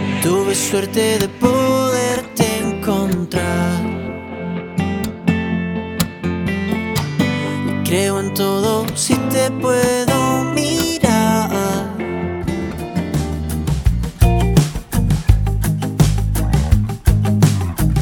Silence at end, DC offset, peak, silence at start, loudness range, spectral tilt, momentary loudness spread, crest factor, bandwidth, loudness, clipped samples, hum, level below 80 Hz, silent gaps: 0 s; under 0.1%; 0 dBFS; 0 s; 4 LU; -5.5 dB/octave; 7 LU; 16 dB; 19.5 kHz; -18 LUFS; under 0.1%; none; -26 dBFS; none